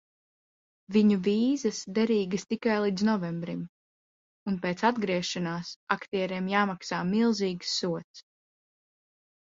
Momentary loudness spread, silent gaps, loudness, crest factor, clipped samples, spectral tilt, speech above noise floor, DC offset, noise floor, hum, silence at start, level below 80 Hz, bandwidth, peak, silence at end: 10 LU; 3.69-4.46 s, 5.76-5.87 s, 8.04-8.14 s; -28 LUFS; 22 dB; under 0.1%; -5.5 dB/octave; over 62 dB; under 0.1%; under -90 dBFS; none; 0.9 s; -70 dBFS; 7.8 kHz; -8 dBFS; 1.25 s